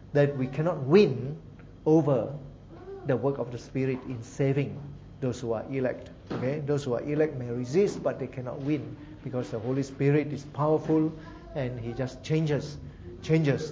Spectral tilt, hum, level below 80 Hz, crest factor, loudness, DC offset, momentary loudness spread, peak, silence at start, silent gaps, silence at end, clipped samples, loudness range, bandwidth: -8 dB/octave; none; -54 dBFS; 20 dB; -29 LUFS; under 0.1%; 17 LU; -8 dBFS; 0 s; none; 0 s; under 0.1%; 4 LU; 7.8 kHz